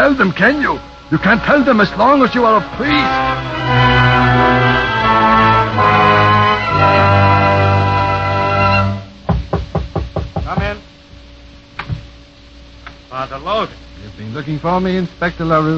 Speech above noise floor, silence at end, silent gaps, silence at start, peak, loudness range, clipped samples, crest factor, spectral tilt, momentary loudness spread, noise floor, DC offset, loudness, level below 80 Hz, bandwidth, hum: 26 dB; 0 s; none; 0 s; 0 dBFS; 15 LU; under 0.1%; 14 dB; -7 dB/octave; 14 LU; -39 dBFS; under 0.1%; -13 LUFS; -32 dBFS; 7.4 kHz; none